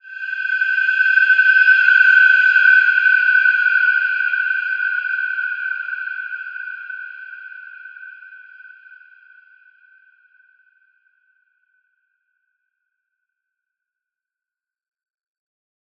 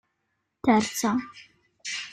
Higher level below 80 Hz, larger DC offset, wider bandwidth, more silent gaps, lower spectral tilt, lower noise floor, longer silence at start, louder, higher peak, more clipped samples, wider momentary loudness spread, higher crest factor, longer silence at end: second, under -90 dBFS vs -62 dBFS; neither; second, 7 kHz vs 15 kHz; neither; second, 5.5 dB/octave vs -4 dB/octave; first, -90 dBFS vs -78 dBFS; second, 0.05 s vs 0.65 s; first, -14 LUFS vs -26 LUFS; first, -2 dBFS vs -8 dBFS; neither; first, 23 LU vs 15 LU; about the same, 18 dB vs 20 dB; first, 7.35 s vs 0 s